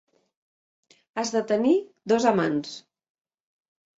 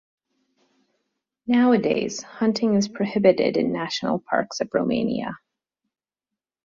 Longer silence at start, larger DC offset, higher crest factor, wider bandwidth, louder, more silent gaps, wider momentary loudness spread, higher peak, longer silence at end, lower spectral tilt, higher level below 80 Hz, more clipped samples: second, 1.15 s vs 1.45 s; neither; about the same, 22 dB vs 20 dB; about the same, 8 kHz vs 7.4 kHz; about the same, -24 LUFS vs -22 LUFS; neither; first, 15 LU vs 10 LU; about the same, -6 dBFS vs -4 dBFS; about the same, 1.2 s vs 1.3 s; about the same, -5 dB/octave vs -5.5 dB/octave; second, -70 dBFS vs -62 dBFS; neither